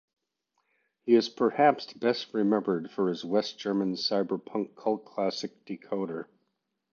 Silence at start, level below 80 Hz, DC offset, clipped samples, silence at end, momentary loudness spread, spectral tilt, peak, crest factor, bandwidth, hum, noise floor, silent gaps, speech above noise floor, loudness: 1.05 s; -80 dBFS; under 0.1%; under 0.1%; 0.7 s; 13 LU; -5.5 dB/octave; -10 dBFS; 20 dB; 7.2 kHz; none; -79 dBFS; none; 51 dB; -29 LUFS